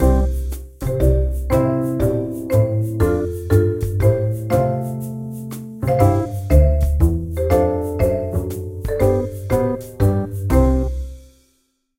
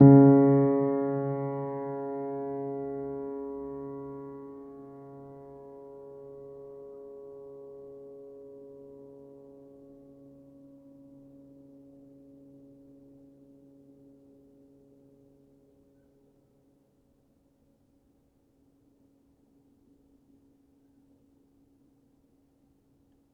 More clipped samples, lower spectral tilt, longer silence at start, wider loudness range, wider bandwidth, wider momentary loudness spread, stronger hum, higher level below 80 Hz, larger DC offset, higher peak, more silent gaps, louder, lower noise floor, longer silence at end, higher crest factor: neither; second, -8.5 dB/octave vs -13.5 dB/octave; about the same, 0 s vs 0 s; second, 2 LU vs 24 LU; first, 16.5 kHz vs 2.4 kHz; second, 11 LU vs 27 LU; neither; first, -24 dBFS vs -68 dBFS; neither; first, 0 dBFS vs -6 dBFS; neither; first, -19 LUFS vs -26 LUFS; about the same, -65 dBFS vs -67 dBFS; second, 0.75 s vs 14.75 s; second, 16 dB vs 26 dB